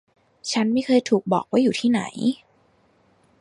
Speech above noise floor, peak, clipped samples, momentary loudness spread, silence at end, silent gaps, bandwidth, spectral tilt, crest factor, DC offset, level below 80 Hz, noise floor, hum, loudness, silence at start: 40 dB; -6 dBFS; under 0.1%; 7 LU; 1.05 s; none; 11 kHz; -5 dB/octave; 16 dB; under 0.1%; -68 dBFS; -61 dBFS; none; -22 LUFS; 0.45 s